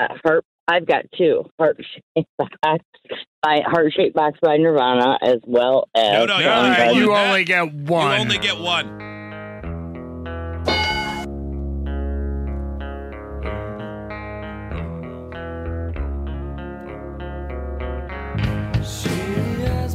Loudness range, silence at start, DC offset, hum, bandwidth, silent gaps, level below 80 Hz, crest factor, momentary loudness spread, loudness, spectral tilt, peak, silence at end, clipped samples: 14 LU; 0 s; under 0.1%; none; 15.5 kHz; 0.45-0.67 s, 1.51-1.58 s, 2.03-2.15 s, 2.29-2.38 s, 2.85-2.93 s, 3.27-3.42 s; -34 dBFS; 16 dB; 16 LU; -20 LUFS; -5.5 dB/octave; -4 dBFS; 0 s; under 0.1%